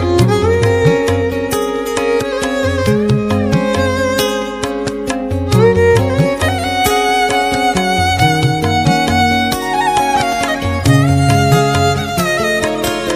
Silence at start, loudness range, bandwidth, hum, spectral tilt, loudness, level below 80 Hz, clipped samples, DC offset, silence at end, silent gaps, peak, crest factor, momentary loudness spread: 0 s; 2 LU; 16 kHz; none; -5.5 dB/octave; -13 LUFS; -34 dBFS; under 0.1%; under 0.1%; 0 s; none; 0 dBFS; 12 dB; 6 LU